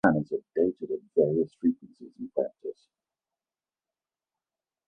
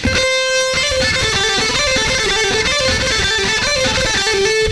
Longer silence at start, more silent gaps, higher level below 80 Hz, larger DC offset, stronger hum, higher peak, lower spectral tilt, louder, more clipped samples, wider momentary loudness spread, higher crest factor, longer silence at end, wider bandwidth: about the same, 0.05 s vs 0 s; neither; second, -66 dBFS vs -32 dBFS; second, under 0.1% vs 0.4%; neither; about the same, -6 dBFS vs -4 dBFS; first, -10 dB/octave vs -2 dB/octave; second, -29 LUFS vs -14 LUFS; neither; first, 16 LU vs 0 LU; first, 24 dB vs 12 dB; first, 2.15 s vs 0 s; second, 5 kHz vs 11 kHz